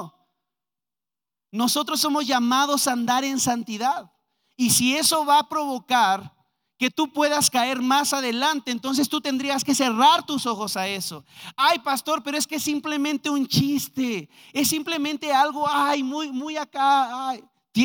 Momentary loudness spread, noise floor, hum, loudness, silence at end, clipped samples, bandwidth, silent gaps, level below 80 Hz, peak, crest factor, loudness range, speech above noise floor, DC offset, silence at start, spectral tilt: 10 LU; under -90 dBFS; none; -22 LUFS; 0 s; under 0.1%; 19.5 kHz; none; -70 dBFS; -4 dBFS; 20 dB; 3 LU; over 67 dB; under 0.1%; 0 s; -2.5 dB/octave